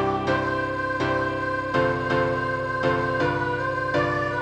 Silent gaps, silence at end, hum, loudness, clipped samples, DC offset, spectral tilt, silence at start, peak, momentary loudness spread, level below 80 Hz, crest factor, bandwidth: none; 0 s; none; -24 LUFS; under 0.1%; under 0.1%; -6.5 dB/octave; 0 s; -8 dBFS; 3 LU; -48 dBFS; 16 dB; 10 kHz